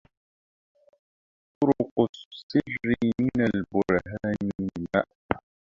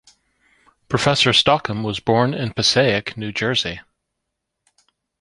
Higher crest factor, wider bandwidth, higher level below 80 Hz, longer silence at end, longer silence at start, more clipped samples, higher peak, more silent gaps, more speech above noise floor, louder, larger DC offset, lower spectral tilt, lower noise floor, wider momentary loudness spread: first, 26 dB vs 20 dB; second, 7.4 kHz vs 11.5 kHz; about the same, -54 dBFS vs -50 dBFS; second, 0.4 s vs 1.4 s; first, 1.6 s vs 0.9 s; neither; about the same, -2 dBFS vs -2 dBFS; first, 1.91-1.96 s, 2.09-2.13 s, 2.25-2.31 s, 2.43-2.49 s, 4.55-4.59 s, 5.15-5.29 s vs none; first, over 64 dB vs 60 dB; second, -27 LUFS vs -18 LUFS; neither; first, -8 dB/octave vs -4 dB/octave; first, under -90 dBFS vs -78 dBFS; second, 8 LU vs 11 LU